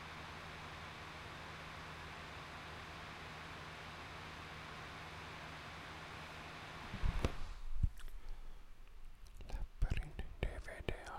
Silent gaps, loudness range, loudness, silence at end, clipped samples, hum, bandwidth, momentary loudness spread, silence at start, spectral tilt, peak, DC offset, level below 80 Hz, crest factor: none; 3 LU; -48 LUFS; 0 s; under 0.1%; none; 14 kHz; 13 LU; 0 s; -5 dB/octave; -18 dBFS; under 0.1%; -46 dBFS; 26 dB